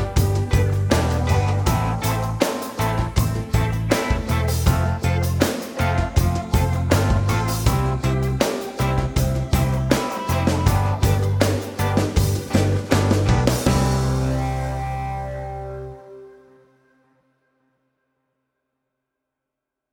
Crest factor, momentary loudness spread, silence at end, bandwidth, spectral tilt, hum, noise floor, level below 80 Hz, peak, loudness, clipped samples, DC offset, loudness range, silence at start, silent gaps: 18 dB; 5 LU; 3.6 s; over 20 kHz; -6 dB/octave; none; -83 dBFS; -28 dBFS; -2 dBFS; -21 LUFS; under 0.1%; under 0.1%; 8 LU; 0 s; none